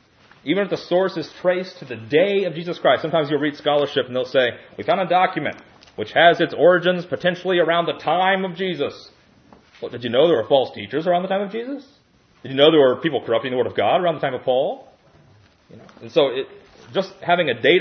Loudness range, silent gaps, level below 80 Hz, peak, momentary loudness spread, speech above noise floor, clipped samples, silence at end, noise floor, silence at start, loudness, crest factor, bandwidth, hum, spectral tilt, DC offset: 4 LU; none; -68 dBFS; 0 dBFS; 14 LU; 33 dB; under 0.1%; 0 s; -53 dBFS; 0.45 s; -20 LUFS; 20 dB; 6.6 kHz; none; -6.5 dB/octave; under 0.1%